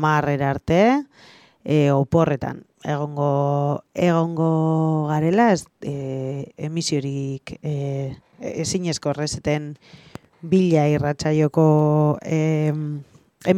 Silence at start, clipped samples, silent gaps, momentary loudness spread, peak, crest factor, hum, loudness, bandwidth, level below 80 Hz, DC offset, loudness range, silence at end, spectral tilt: 0 s; under 0.1%; none; 13 LU; -4 dBFS; 18 dB; none; -21 LUFS; 11 kHz; -52 dBFS; under 0.1%; 7 LU; 0 s; -6.5 dB/octave